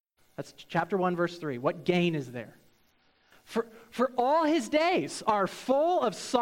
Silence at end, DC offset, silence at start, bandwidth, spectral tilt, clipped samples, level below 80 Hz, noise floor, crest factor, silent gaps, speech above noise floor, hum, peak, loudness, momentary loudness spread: 0 s; under 0.1%; 0.4 s; 16.5 kHz; -5.5 dB/octave; under 0.1%; -68 dBFS; -67 dBFS; 18 dB; none; 38 dB; none; -12 dBFS; -28 LUFS; 16 LU